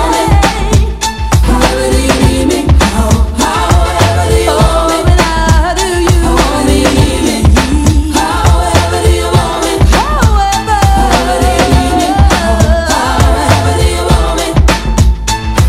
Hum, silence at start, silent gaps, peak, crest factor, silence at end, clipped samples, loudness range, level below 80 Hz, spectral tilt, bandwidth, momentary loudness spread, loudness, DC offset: none; 0 s; none; 0 dBFS; 8 dB; 0 s; 0.9%; 1 LU; -12 dBFS; -5 dB/octave; 15.5 kHz; 2 LU; -10 LUFS; under 0.1%